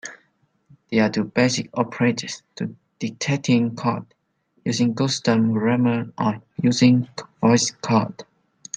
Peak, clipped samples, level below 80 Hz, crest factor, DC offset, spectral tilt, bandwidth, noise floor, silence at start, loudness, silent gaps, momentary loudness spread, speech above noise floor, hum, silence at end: -4 dBFS; under 0.1%; -64 dBFS; 18 dB; under 0.1%; -5 dB/octave; 9.4 kHz; -65 dBFS; 0.05 s; -21 LUFS; none; 14 LU; 44 dB; none; 0 s